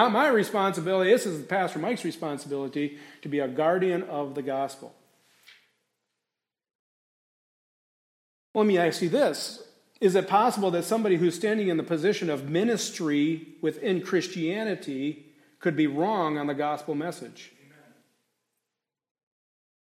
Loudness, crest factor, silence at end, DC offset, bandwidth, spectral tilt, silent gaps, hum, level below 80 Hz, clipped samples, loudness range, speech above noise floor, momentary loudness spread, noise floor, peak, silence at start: -27 LUFS; 20 dB; 2.5 s; under 0.1%; 16 kHz; -5 dB/octave; 6.75-8.54 s; none; -80 dBFS; under 0.1%; 10 LU; 62 dB; 10 LU; -88 dBFS; -8 dBFS; 0 s